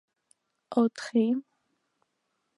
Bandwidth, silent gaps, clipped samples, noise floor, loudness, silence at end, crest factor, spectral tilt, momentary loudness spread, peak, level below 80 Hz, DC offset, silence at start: 11 kHz; none; under 0.1%; -79 dBFS; -28 LUFS; 1.15 s; 20 dB; -6 dB/octave; 5 LU; -12 dBFS; -86 dBFS; under 0.1%; 0.7 s